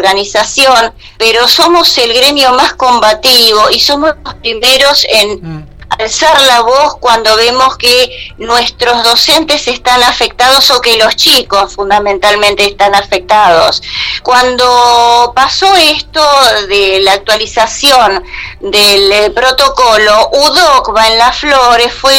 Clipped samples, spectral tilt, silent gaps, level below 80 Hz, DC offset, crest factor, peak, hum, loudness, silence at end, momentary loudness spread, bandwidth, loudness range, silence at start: 0.7%; -1 dB/octave; none; -34 dBFS; under 0.1%; 8 dB; 0 dBFS; none; -6 LUFS; 0 s; 7 LU; over 20 kHz; 2 LU; 0 s